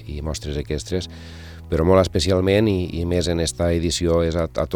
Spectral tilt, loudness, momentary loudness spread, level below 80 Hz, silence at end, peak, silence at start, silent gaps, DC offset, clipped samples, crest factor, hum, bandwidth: -5.5 dB/octave; -21 LUFS; 12 LU; -36 dBFS; 0 s; -4 dBFS; 0 s; none; 0.1%; under 0.1%; 18 dB; none; 15.5 kHz